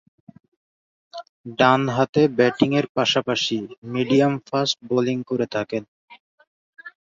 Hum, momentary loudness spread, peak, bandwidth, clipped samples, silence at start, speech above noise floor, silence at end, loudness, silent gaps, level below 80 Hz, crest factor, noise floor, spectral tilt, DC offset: none; 13 LU; -2 dBFS; 7.8 kHz; under 0.1%; 1.15 s; over 69 dB; 0.3 s; -21 LUFS; 1.29-1.44 s, 2.09-2.13 s, 2.89-2.95 s, 3.78-3.82 s, 5.88-6.08 s, 6.20-6.38 s, 6.47-6.73 s; -62 dBFS; 20 dB; under -90 dBFS; -5.5 dB/octave; under 0.1%